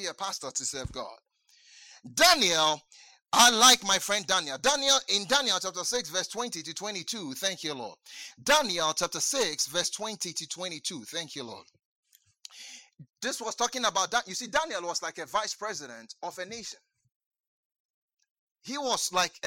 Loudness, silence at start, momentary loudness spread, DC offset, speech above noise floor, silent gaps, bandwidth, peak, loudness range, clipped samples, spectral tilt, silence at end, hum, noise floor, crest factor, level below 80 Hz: -26 LUFS; 0 s; 19 LU; under 0.1%; 32 dB; 11.85-12.03 s, 17.16-17.20 s, 17.26-17.31 s, 17.40-17.70 s, 17.80-18.08 s, 18.31-18.55 s; 17 kHz; -4 dBFS; 15 LU; under 0.1%; -0.5 dB/octave; 0 s; none; -61 dBFS; 26 dB; -64 dBFS